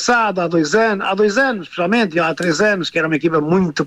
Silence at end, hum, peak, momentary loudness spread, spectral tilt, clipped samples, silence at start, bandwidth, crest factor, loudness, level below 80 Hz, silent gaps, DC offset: 0 s; none; -4 dBFS; 3 LU; -5 dB/octave; under 0.1%; 0 s; 12 kHz; 12 dB; -16 LUFS; -54 dBFS; none; under 0.1%